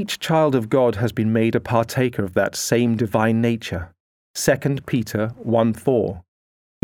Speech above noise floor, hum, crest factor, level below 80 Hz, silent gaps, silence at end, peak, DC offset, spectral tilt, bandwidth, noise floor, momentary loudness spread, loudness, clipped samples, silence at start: over 70 dB; none; 18 dB; -52 dBFS; 4.00-4.34 s; 0.65 s; -4 dBFS; under 0.1%; -5.5 dB/octave; 18.5 kHz; under -90 dBFS; 8 LU; -20 LUFS; under 0.1%; 0 s